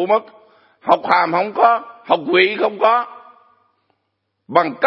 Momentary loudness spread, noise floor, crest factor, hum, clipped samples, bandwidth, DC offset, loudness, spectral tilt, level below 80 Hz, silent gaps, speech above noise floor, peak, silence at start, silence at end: 6 LU; -72 dBFS; 18 dB; none; under 0.1%; 5.8 kHz; under 0.1%; -16 LUFS; -6.5 dB/octave; -74 dBFS; none; 56 dB; 0 dBFS; 0 s; 0 s